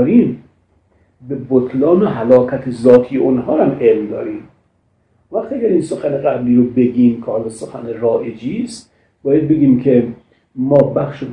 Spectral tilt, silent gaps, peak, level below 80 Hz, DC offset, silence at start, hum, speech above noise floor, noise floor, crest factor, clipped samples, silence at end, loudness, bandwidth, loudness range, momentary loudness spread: -8.5 dB/octave; none; 0 dBFS; -52 dBFS; under 0.1%; 0 s; none; 46 dB; -59 dBFS; 14 dB; 0.2%; 0 s; -14 LUFS; 10.5 kHz; 4 LU; 15 LU